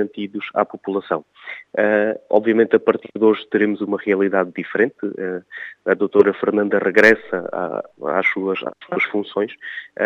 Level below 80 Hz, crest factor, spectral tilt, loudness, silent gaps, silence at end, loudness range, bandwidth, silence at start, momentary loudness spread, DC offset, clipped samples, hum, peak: -68 dBFS; 20 dB; -6.5 dB/octave; -19 LUFS; none; 0 s; 2 LU; 7.8 kHz; 0 s; 12 LU; under 0.1%; under 0.1%; none; 0 dBFS